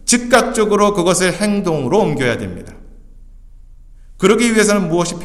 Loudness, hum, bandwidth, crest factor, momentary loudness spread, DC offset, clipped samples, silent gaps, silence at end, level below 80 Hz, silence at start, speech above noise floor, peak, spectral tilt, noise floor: -14 LUFS; none; 15 kHz; 16 dB; 6 LU; under 0.1%; under 0.1%; none; 0 s; -38 dBFS; 0.05 s; 24 dB; 0 dBFS; -4 dB/octave; -39 dBFS